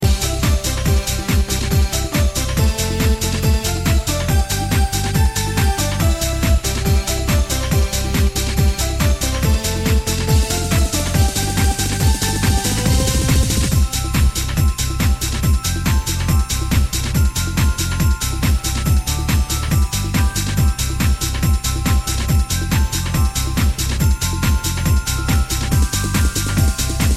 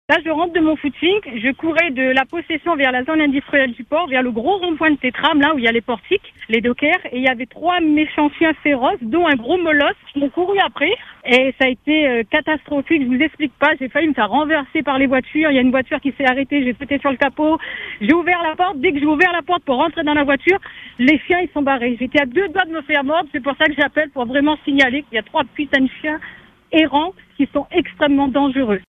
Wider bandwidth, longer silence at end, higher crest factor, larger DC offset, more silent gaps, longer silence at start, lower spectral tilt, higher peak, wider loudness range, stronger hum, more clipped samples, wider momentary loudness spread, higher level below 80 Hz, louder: first, 16 kHz vs 7.8 kHz; about the same, 0 s vs 0.1 s; about the same, 14 dB vs 16 dB; neither; neither; about the same, 0 s vs 0.1 s; second, -4.5 dB/octave vs -6 dB/octave; second, -4 dBFS vs 0 dBFS; about the same, 1 LU vs 1 LU; neither; neither; second, 2 LU vs 6 LU; first, -20 dBFS vs -50 dBFS; about the same, -18 LUFS vs -17 LUFS